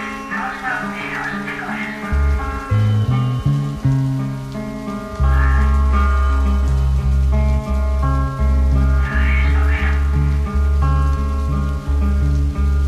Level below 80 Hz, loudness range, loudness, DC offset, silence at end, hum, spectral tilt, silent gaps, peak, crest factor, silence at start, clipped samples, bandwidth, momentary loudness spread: -18 dBFS; 2 LU; -19 LUFS; under 0.1%; 0 s; none; -7.5 dB/octave; none; -6 dBFS; 10 dB; 0 s; under 0.1%; 7.8 kHz; 7 LU